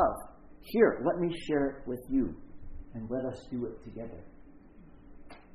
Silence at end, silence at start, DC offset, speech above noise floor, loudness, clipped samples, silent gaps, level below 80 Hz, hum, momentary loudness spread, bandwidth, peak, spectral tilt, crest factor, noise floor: 0 s; 0 s; under 0.1%; 22 dB; -32 LUFS; under 0.1%; none; -50 dBFS; none; 25 LU; 13 kHz; -10 dBFS; -7.5 dB/octave; 24 dB; -53 dBFS